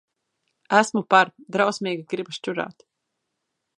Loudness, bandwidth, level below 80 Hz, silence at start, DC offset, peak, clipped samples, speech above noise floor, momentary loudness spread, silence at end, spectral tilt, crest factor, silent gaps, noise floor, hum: -22 LUFS; 11.5 kHz; -76 dBFS; 0.7 s; under 0.1%; -2 dBFS; under 0.1%; 57 dB; 12 LU; 1.05 s; -4 dB/octave; 24 dB; none; -79 dBFS; none